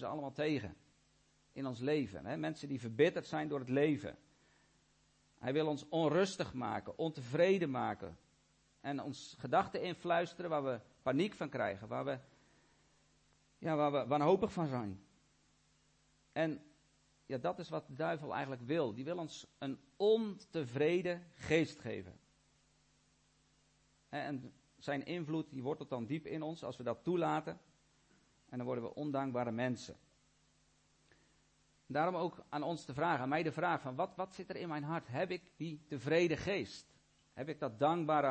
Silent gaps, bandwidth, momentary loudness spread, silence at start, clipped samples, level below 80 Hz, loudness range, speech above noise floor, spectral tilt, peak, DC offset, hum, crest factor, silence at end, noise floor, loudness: none; 8.4 kHz; 13 LU; 0 s; under 0.1%; -72 dBFS; 6 LU; 36 dB; -6.5 dB/octave; -18 dBFS; under 0.1%; none; 20 dB; 0 s; -73 dBFS; -38 LUFS